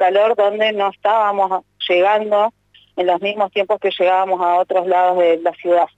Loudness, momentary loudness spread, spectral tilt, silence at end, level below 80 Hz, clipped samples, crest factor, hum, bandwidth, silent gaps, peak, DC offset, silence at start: -16 LUFS; 5 LU; -5.5 dB/octave; 0.1 s; -68 dBFS; under 0.1%; 10 dB; 50 Hz at -65 dBFS; 7.8 kHz; none; -6 dBFS; under 0.1%; 0 s